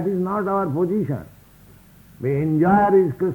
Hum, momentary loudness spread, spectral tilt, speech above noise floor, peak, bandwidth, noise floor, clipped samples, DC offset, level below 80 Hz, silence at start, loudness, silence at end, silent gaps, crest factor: none; 11 LU; -10 dB/octave; 29 dB; -4 dBFS; 19.5 kHz; -49 dBFS; under 0.1%; under 0.1%; -52 dBFS; 0 s; -20 LUFS; 0 s; none; 16 dB